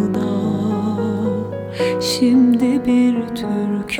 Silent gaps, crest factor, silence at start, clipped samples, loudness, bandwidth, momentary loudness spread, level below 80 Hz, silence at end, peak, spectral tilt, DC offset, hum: none; 12 dB; 0 s; under 0.1%; -18 LUFS; 15 kHz; 8 LU; -52 dBFS; 0 s; -6 dBFS; -6 dB/octave; under 0.1%; none